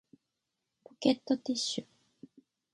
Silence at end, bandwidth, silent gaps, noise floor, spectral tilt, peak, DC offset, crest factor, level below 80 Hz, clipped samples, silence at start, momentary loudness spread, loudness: 0.9 s; 11.5 kHz; none; -86 dBFS; -3.5 dB/octave; -12 dBFS; under 0.1%; 24 dB; -80 dBFS; under 0.1%; 1 s; 5 LU; -32 LUFS